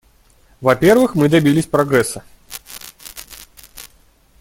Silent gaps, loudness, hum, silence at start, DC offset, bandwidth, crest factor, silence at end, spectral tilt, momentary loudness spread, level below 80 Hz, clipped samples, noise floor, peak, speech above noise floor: none; -15 LUFS; none; 0.6 s; under 0.1%; 17 kHz; 18 dB; 0.55 s; -5.5 dB/octave; 25 LU; -48 dBFS; under 0.1%; -52 dBFS; 0 dBFS; 38 dB